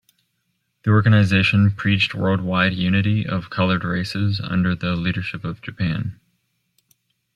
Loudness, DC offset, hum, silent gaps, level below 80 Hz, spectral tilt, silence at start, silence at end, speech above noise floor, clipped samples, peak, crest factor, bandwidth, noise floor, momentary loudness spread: -20 LUFS; under 0.1%; none; none; -50 dBFS; -7 dB/octave; 0.85 s; 1.2 s; 53 dB; under 0.1%; -4 dBFS; 16 dB; 9.6 kHz; -72 dBFS; 11 LU